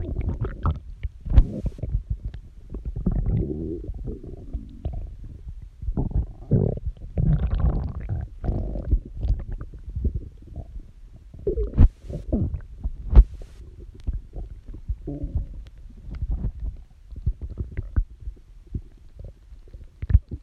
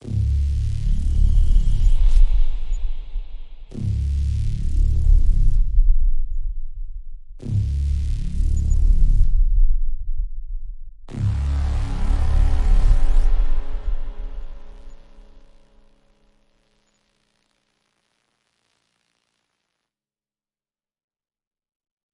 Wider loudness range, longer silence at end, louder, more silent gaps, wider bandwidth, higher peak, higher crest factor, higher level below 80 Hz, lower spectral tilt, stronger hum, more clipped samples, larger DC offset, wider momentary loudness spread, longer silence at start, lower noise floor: first, 9 LU vs 4 LU; second, 0 s vs 6.95 s; second, -28 LUFS vs -24 LUFS; neither; second, 3.8 kHz vs 4.3 kHz; first, 0 dBFS vs -4 dBFS; first, 24 dB vs 14 dB; second, -26 dBFS vs -20 dBFS; first, -10.5 dB/octave vs -7.5 dB/octave; neither; neither; neither; first, 21 LU vs 17 LU; about the same, 0 s vs 0.05 s; second, -44 dBFS vs under -90 dBFS